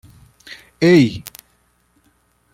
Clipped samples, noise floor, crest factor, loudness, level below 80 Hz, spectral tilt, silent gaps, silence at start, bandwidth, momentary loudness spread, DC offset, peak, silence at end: under 0.1%; -61 dBFS; 18 dB; -14 LUFS; -54 dBFS; -6.5 dB/octave; none; 0.8 s; 16.5 kHz; 26 LU; under 0.1%; -2 dBFS; 1.3 s